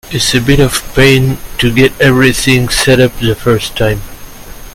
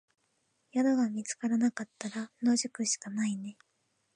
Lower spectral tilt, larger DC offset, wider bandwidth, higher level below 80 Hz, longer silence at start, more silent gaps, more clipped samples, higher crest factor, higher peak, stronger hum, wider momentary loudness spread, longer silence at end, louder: about the same, -4.5 dB/octave vs -3.5 dB/octave; neither; first, 16.5 kHz vs 10.5 kHz; first, -24 dBFS vs -84 dBFS; second, 0.05 s vs 0.75 s; neither; first, 0.3% vs under 0.1%; second, 10 dB vs 16 dB; first, 0 dBFS vs -18 dBFS; neither; second, 6 LU vs 10 LU; second, 0 s vs 0.65 s; first, -10 LUFS vs -32 LUFS